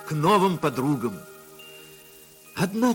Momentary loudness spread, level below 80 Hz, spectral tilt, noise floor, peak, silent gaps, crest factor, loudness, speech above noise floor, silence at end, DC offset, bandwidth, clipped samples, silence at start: 24 LU; -62 dBFS; -6 dB/octave; -49 dBFS; -8 dBFS; none; 18 dB; -24 LUFS; 27 dB; 0 s; under 0.1%; 17 kHz; under 0.1%; 0 s